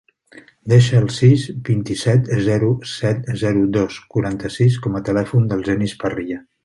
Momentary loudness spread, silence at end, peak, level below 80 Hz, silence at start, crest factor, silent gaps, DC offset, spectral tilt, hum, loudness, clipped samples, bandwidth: 9 LU; 0.25 s; -2 dBFS; -46 dBFS; 0.35 s; 16 dB; none; under 0.1%; -7 dB/octave; none; -18 LUFS; under 0.1%; 11.5 kHz